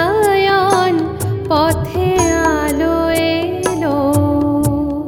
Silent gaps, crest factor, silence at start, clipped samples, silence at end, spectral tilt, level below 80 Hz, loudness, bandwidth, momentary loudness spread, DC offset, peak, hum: none; 14 dB; 0 s; under 0.1%; 0 s; -5.5 dB/octave; -34 dBFS; -15 LUFS; over 20 kHz; 5 LU; under 0.1%; 0 dBFS; none